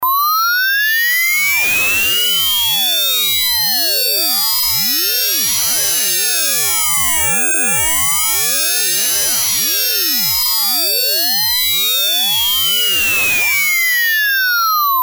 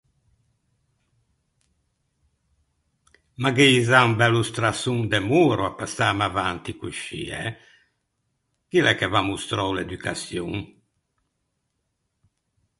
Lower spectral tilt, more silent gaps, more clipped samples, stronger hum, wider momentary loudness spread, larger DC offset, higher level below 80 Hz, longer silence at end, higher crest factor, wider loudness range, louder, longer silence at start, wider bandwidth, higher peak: second, 1.5 dB/octave vs -5 dB/octave; neither; neither; neither; second, 1 LU vs 15 LU; neither; first, -46 dBFS vs -52 dBFS; second, 0 s vs 2.15 s; second, 10 dB vs 24 dB; second, 0 LU vs 9 LU; first, -12 LUFS vs -22 LUFS; second, 0 s vs 3.4 s; first, over 20 kHz vs 11.5 kHz; second, -4 dBFS vs 0 dBFS